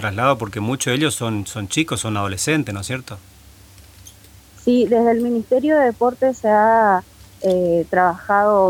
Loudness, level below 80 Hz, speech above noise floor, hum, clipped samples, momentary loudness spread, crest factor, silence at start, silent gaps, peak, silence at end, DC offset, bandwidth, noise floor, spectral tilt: -18 LUFS; -50 dBFS; 28 dB; none; under 0.1%; 10 LU; 16 dB; 0 s; none; -2 dBFS; 0 s; under 0.1%; 17.5 kHz; -45 dBFS; -5 dB/octave